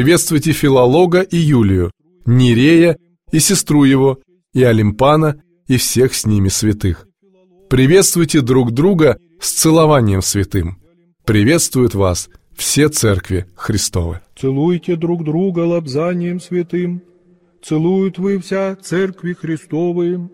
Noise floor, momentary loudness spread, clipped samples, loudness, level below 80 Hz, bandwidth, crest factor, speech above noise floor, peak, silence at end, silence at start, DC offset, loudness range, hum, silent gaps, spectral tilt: -53 dBFS; 11 LU; under 0.1%; -14 LUFS; -38 dBFS; 16.5 kHz; 14 dB; 39 dB; 0 dBFS; 0.05 s; 0 s; under 0.1%; 6 LU; none; none; -5 dB/octave